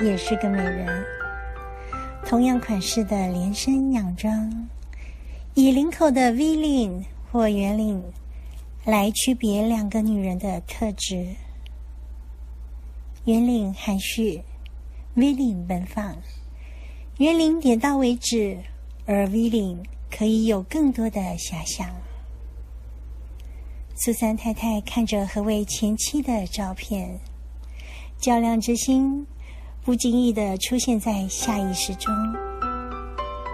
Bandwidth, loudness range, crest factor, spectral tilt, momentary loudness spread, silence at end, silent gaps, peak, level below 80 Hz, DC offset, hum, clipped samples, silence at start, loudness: 15 kHz; 5 LU; 18 dB; -5 dB/octave; 20 LU; 0 s; none; -6 dBFS; -38 dBFS; under 0.1%; none; under 0.1%; 0 s; -23 LUFS